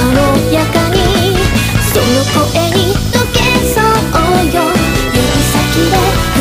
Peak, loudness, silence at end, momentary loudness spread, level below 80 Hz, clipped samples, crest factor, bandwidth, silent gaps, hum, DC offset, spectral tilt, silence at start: 0 dBFS; -11 LUFS; 0 s; 2 LU; -20 dBFS; under 0.1%; 10 dB; 15.5 kHz; none; none; under 0.1%; -4.5 dB/octave; 0 s